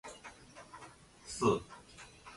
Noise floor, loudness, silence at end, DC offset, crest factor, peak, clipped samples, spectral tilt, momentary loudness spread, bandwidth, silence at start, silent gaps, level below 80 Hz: -56 dBFS; -34 LUFS; 0 s; under 0.1%; 24 dB; -16 dBFS; under 0.1%; -5 dB/octave; 22 LU; 11.5 kHz; 0.05 s; none; -64 dBFS